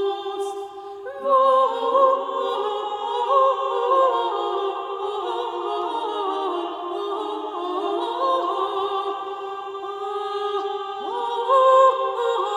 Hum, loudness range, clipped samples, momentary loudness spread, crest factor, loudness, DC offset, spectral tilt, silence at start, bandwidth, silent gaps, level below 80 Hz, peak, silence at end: none; 6 LU; under 0.1%; 12 LU; 18 dB; -22 LUFS; under 0.1%; -3 dB/octave; 0 s; 10.5 kHz; none; -74 dBFS; -6 dBFS; 0 s